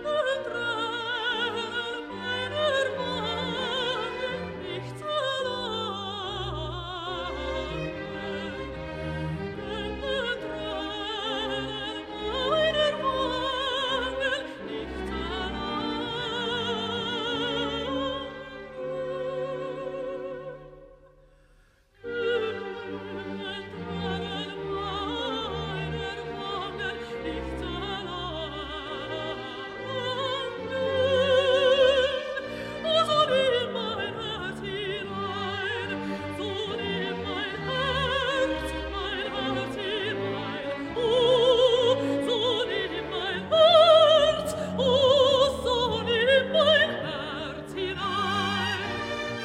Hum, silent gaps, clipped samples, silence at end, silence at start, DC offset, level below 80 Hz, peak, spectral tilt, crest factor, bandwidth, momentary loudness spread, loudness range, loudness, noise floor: none; none; under 0.1%; 0 s; 0 s; under 0.1%; -48 dBFS; -8 dBFS; -4.5 dB/octave; 20 dB; 12.5 kHz; 13 LU; 12 LU; -27 LUFS; -60 dBFS